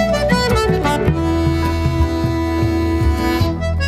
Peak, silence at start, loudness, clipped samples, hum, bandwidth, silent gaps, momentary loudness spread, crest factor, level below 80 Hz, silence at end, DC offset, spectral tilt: -2 dBFS; 0 s; -17 LUFS; under 0.1%; none; 15 kHz; none; 3 LU; 14 dB; -24 dBFS; 0 s; under 0.1%; -6.5 dB/octave